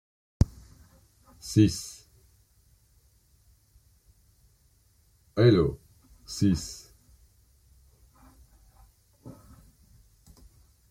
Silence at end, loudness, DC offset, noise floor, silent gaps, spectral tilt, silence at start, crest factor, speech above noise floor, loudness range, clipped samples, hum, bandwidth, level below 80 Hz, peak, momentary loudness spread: 1.6 s; -26 LUFS; under 0.1%; -64 dBFS; none; -6.5 dB/octave; 0.4 s; 24 dB; 40 dB; 6 LU; under 0.1%; none; 16 kHz; -46 dBFS; -8 dBFS; 28 LU